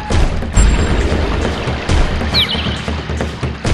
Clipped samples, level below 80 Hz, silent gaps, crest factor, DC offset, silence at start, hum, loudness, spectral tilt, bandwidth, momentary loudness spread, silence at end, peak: under 0.1%; -18 dBFS; none; 14 dB; under 0.1%; 0 s; none; -16 LUFS; -5 dB/octave; 12.5 kHz; 7 LU; 0 s; 0 dBFS